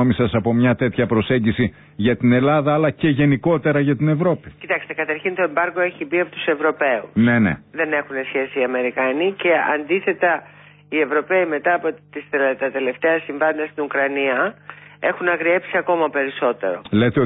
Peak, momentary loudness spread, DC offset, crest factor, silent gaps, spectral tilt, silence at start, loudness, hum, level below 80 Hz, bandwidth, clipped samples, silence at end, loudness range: -6 dBFS; 7 LU; under 0.1%; 14 dB; none; -12 dB/octave; 0 s; -19 LUFS; none; -50 dBFS; 4 kHz; under 0.1%; 0 s; 3 LU